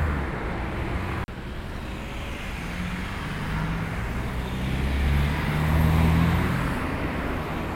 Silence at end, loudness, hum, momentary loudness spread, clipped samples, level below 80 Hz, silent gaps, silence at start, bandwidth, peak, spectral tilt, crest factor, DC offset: 0 s; -27 LUFS; none; 12 LU; under 0.1%; -32 dBFS; none; 0 s; 16.5 kHz; -10 dBFS; -6.5 dB/octave; 16 dB; under 0.1%